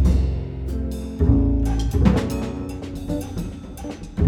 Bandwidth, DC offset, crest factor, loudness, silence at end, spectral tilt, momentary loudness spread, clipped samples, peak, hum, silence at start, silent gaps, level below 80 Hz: 14 kHz; under 0.1%; 18 dB; -23 LUFS; 0 s; -8 dB/octave; 13 LU; under 0.1%; -4 dBFS; none; 0 s; none; -24 dBFS